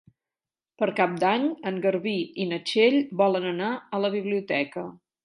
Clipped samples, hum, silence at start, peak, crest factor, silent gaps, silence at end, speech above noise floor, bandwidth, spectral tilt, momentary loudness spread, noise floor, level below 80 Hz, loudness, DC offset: under 0.1%; none; 0.8 s; -6 dBFS; 20 dB; none; 0.3 s; over 65 dB; 11.5 kHz; -6 dB/octave; 8 LU; under -90 dBFS; -78 dBFS; -25 LUFS; under 0.1%